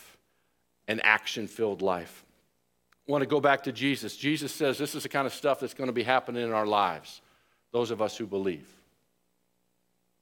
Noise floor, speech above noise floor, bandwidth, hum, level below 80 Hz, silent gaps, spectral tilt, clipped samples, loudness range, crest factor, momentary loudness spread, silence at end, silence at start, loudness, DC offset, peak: -76 dBFS; 47 dB; 17.5 kHz; 60 Hz at -65 dBFS; -76 dBFS; none; -4.5 dB/octave; under 0.1%; 4 LU; 26 dB; 10 LU; 1.6 s; 0 s; -29 LUFS; under 0.1%; -4 dBFS